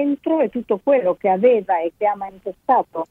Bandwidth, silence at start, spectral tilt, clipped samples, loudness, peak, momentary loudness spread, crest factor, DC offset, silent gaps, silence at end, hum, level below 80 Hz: 4 kHz; 0 s; -9 dB/octave; under 0.1%; -19 LUFS; -4 dBFS; 8 LU; 14 dB; under 0.1%; none; 0.05 s; none; -62 dBFS